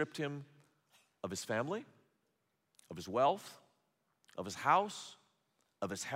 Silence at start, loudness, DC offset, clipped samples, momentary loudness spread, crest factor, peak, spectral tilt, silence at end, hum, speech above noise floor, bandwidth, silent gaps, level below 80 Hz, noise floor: 0 s; -37 LUFS; under 0.1%; under 0.1%; 19 LU; 24 dB; -16 dBFS; -4 dB/octave; 0 s; none; 45 dB; 16 kHz; none; -84 dBFS; -82 dBFS